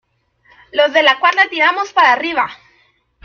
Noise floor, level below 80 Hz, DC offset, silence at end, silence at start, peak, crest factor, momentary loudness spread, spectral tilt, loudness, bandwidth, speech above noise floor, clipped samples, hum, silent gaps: -57 dBFS; -62 dBFS; under 0.1%; 0.7 s; 0.75 s; 0 dBFS; 16 dB; 8 LU; -1.5 dB/octave; -13 LUFS; 7 kHz; 43 dB; under 0.1%; none; none